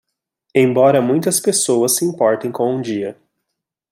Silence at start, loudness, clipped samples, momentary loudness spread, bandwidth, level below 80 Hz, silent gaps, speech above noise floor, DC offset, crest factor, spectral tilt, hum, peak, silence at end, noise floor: 0.55 s; -16 LUFS; under 0.1%; 9 LU; 16.5 kHz; -64 dBFS; none; 63 dB; under 0.1%; 16 dB; -4 dB/octave; none; -2 dBFS; 0.8 s; -79 dBFS